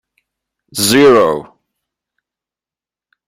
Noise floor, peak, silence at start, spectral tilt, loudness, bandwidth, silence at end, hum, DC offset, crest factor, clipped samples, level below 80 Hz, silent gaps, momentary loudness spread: -90 dBFS; 0 dBFS; 0.75 s; -3.5 dB/octave; -10 LUFS; 16 kHz; 1.85 s; none; under 0.1%; 16 dB; under 0.1%; -56 dBFS; none; 16 LU